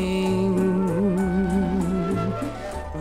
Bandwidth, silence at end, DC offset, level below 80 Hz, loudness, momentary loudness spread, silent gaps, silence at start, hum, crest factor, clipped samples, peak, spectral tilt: 12.5 kHz; 0 s; under 0.1%; -38 dBFS; -23 LUFS; 9 LU; none; 0 s; none; 10 dB; under 0.1%; -12 dBFS; -7.5 dB/octave